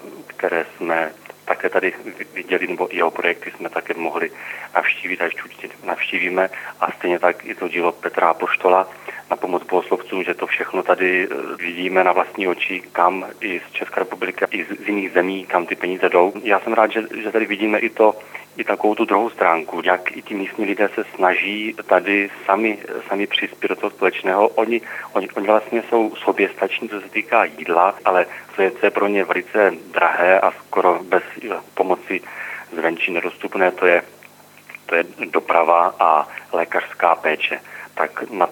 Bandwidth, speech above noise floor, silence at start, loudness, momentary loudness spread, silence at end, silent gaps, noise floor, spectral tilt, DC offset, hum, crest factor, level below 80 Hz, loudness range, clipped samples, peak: over 20 kHz; 26 dB; 0 s; -19 LUFS; 9 LU; 0 s; none; -46 dBFS; -5 dB/octave; under 0.1%; 50 Hz at -60 dBFS; 20 dB; -80 dBFS; 4 LU; under 0.1%; 0 dBFS